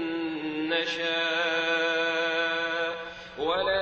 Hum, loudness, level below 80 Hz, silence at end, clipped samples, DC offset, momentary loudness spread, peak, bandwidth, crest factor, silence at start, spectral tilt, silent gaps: none; -27 LUFS; -62 dBFS; 0 s; under 0.1%; under 0.1%; 7 LU; -14 dBFS; 7.8 kHz; 14 dB; 0 s; -3 dB/octave; none